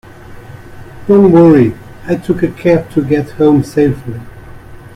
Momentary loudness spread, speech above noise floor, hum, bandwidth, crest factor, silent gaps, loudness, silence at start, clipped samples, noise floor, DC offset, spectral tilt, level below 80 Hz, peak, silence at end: 19 LU; 22 dB; none; 14 kHz; 12 dB; none; -11 LUFS; 0.3 s; under 0.1%; -32 dBFS; under 0.1%; -9 dB/octave; -38 dBFS; 0 dBFS; 0.15 s